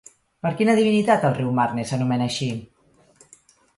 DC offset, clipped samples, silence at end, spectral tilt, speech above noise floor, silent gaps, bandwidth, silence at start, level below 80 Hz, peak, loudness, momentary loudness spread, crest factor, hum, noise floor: under 0.1%; under 0.1%; 1.1 s; -6 dB/octave; 36 dB; none; 11.5 kHz; 0.45 s; -60 dBFS; -4 dBFS; -21 LUFS; 11 LU; 20 dB; none; -56 dBFS